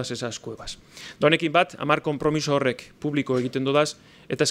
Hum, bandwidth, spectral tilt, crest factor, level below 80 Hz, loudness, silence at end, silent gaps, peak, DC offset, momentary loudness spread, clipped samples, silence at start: none; 15.5 kHz; -4.5 dB/octave; 20 dB; -56 dBFS; -24 LUFS; 0 s; none; -4 dBFS; under 0.1%; 16 LU; under 0.1%; 0 s